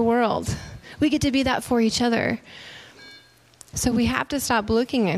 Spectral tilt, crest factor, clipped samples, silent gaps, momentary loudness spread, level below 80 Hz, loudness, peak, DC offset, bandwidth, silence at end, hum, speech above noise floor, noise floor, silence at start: -4.5 dB/octave; 18 dB; under 0.1%; none; 19 LU; -44 dBFS; -23 LUFS; -6 dBFS; under 0.1%; 14.5 kHz; 0 s; none; 29 dB; -51 dBFS; 0 s